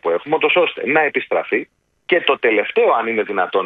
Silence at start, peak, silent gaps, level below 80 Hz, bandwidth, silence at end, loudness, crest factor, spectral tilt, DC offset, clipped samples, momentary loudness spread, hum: 0.05 s; 0 dBFS; none; -68 dBFS; 4.5 kHz; 0 s; -17 LUFS; 18 dB; -7 dB/octave; under 0.1%; under 0.1%; 5 LU; none